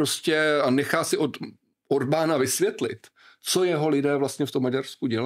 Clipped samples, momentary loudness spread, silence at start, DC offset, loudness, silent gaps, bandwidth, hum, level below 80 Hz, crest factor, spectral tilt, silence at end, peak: under 0.1%; 10 LU; 0 s; under 0.1%; -24 LUFS; none; 16 kHz; none; -74 dBFS; 20 dB; -4 dB/octave; 0 s; -6 dBFS